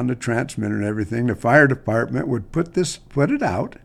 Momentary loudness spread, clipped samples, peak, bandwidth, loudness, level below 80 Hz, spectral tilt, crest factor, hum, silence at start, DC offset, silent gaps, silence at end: 9 LU; under 0.1%; 0 dBFS; 13.5 kHz; -21 LUFS; -46 dBFS; -6.5 dB/octave; 20 dB; none; 0 s; under 0.1%; none; 0.15 s